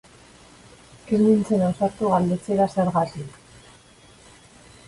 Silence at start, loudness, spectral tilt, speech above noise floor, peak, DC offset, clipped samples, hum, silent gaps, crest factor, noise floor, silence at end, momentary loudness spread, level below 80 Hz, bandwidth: 1.05 s; -22 LUFS; -8 dB/octave; 30 dB; -6 dBFS; under 0.1%; under 0.1%; none; none; 18 dB; -51 dBFS; 1.6 s; 9 LU; -56 dBFS; 11.5 kHz